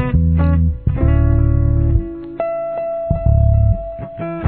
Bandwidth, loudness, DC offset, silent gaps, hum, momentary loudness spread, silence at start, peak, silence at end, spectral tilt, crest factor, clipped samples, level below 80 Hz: 3.1 kHz; -17 LUFS; 0.3%; none; none; 10 LU; 0 s; -2 dBFS; 0 s; -13.5 dB/octave; 12 dB; under 0.1%; -18 dBFS